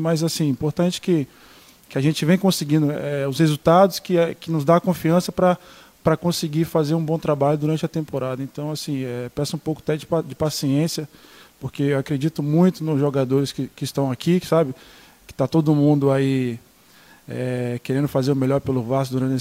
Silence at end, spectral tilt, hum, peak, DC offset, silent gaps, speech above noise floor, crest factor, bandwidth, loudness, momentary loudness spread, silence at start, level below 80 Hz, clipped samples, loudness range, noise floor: 0 s; -6.5 dB/octave; none; -2 dBFS; under 0.1%; none; 30 dB; 18 dB; 16 kHz; -21 LUFS; 9 LU; 0 s; -54 dBFS; under 0.1%; 5 LU; -51 dBFS